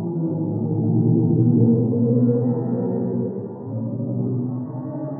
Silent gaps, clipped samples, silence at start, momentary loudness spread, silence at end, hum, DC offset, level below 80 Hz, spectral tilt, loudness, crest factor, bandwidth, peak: none; under 0.1%; 0 s; 11 LU; 0 s; none; under 0.1%; -68 dBFS; -17.5 dB/octave; -21 LUFS; 14 dB; 1.9 kHz; -6 dBFS